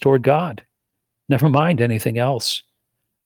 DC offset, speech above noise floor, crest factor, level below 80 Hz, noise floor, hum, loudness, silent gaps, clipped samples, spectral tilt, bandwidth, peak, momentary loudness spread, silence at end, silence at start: under 0.1%; 61 dB; 16 dB; -60 dBFS; -78 dBFS; none; -19 LUFS; none; under 0.1%; -6 dB/octave; 19.5 kHz; -4 dBFS; 11 LU; 0.65 s; 0 s